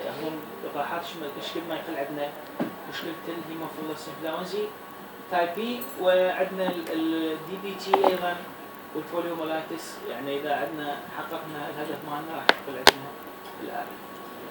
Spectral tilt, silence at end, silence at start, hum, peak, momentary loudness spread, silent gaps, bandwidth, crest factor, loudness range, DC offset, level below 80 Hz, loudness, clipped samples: -3.5 dB/octave; 0 s; 0 s; none; 0 dBFS; 14 LU; none; over 20 kHz; 30 dB; 7 LU; under 0.1%; -64 dBFS; -29 LUFS; under 0.1%